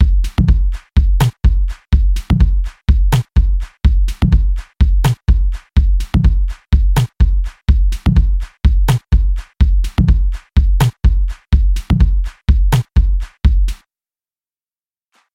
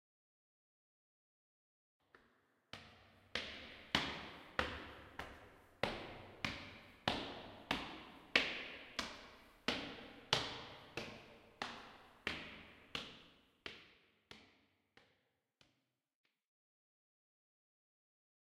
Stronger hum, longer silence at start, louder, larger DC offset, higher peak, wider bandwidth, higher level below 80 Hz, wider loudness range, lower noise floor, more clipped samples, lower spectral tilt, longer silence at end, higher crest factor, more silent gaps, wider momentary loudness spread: neither; second, 0 s vs 2.15 s; first, -16 LUFS vs -44 LUFS; neither; first, -2 dBFS vs -12 dBFS; second, 13.5 kHz vs 15.5 kHz; first, -14 dBFS vs -68 dBFS; second, 1 LU vs 14 LU; first, under -90 dBFS vs -84 dBFS; neither; first, -7 dB/octave vs -3 dB/octave; second, 1.6 s vs 3.5 s; second, 12 dB vs 36 dB; neither; second, 4 LU vs 20 LU